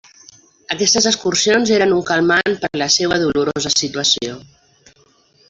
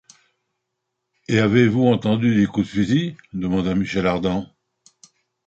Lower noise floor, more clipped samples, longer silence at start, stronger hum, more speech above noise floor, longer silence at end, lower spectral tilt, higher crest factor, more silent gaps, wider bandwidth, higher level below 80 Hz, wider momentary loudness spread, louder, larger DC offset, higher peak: second, -54 dBFS vs -78 dBFS; neither; second, 0.7 s vs 1.3 s; neither; second, 38 dB vs 60 dB; about the same, 1.05 s vs 1 s; second, -2.5 dB/octave vs -7 dB/octave; about the same, 16 dB vs 18 dB; neither; about the same, 8.2 kHz vs 8 kHz; about the same, -52 dBFS vs -48 dBFS; about the same, 6 LU vs 8 LU; first, -15 LUFS vs -20 LUFS; neither; about the same, -2 dBFS vs -4 dBFS